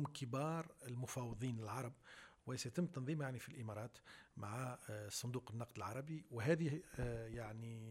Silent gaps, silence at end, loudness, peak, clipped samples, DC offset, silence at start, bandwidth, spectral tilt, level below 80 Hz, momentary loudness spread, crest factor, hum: none; 0 s; -46 LUFS; -26 dBFS; under 0.1%; under 0.1%; 0 s; 16 kHz; -5.5 dB/octave; -66 dBFS; 10 LU; 20 dB; none